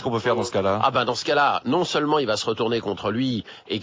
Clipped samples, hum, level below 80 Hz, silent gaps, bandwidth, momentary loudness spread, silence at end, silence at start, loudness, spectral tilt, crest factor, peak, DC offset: under 0.1%; none; -56 dBFS; none; 7.8 kHz; 6 LU; 0 s; 0 s; -23 LUFS; -5 dB/octave; 16 dB; -6 dBFS; under 0.1%